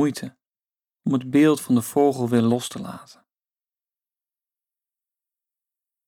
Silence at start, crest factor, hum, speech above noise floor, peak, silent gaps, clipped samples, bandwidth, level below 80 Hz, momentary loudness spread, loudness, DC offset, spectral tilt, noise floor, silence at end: 0 s; 18 dB; none; over 69 dB; -8 dBFS; 0.47-0.51 s; under 0.1%; 18.5 kHz; -70 dBFS; 18 LU; -21 LUFS; under 0.1%; -6 dB/octave; under -90 dBFS; 3.05 s